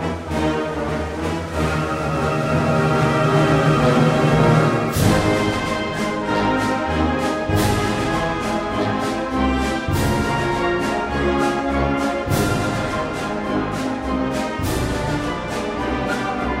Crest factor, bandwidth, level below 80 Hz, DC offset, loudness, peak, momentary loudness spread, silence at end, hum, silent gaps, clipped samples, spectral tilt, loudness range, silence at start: 16 dB; 16 kHz; -34 dBFS; under 0.1%; -20 LUFS; -4 dBFS; 8 LU; 0 s; none; none; under 0.1%; -6 dB/octave; 5 LU; 0 s